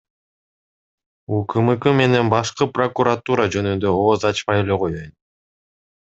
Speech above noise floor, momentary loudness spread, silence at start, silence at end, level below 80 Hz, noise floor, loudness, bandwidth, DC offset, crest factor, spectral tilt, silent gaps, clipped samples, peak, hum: over 72 dB; 7 LU; 1.3 s; 1 s; -54 dBFS; under -90 dBFS; -19 LUFS; 8 kHz; under 0.1%; 20 dB; -6 dB/octave; none; under 0.1%; 0 dBFS; none